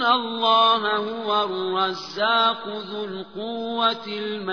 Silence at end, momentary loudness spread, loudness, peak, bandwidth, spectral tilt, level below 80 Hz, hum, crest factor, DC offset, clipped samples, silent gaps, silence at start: 0 s; 14 LU; -22 LUFS; -6 dBFS; 5.4 kHz; -4.5 dB/octave; -74 dBFS; none; 16 dB; 0.2%; under 0.1%; none; 0 s